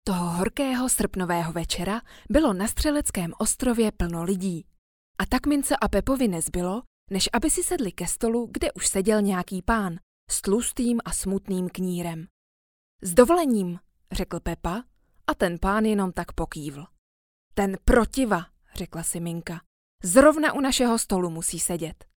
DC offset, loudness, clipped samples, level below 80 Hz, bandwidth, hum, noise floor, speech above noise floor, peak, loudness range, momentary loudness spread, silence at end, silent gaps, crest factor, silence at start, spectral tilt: under 0.1%; -25 LUFS; under 0.1%; -38 dBFS; 19.5 kHz; none; under -90 dBFS; over 66 dB; -2 dBFS; 4 LU; 12 LU; 0.1 s; 4.78-5.15 s, 6.87-7.07 s, 10.03-10.27 s, 12.30-12.99 s, 16.98-17.51 s, 19.66-19.99 s; 22 dB; 0.05 s; -4 dB/octave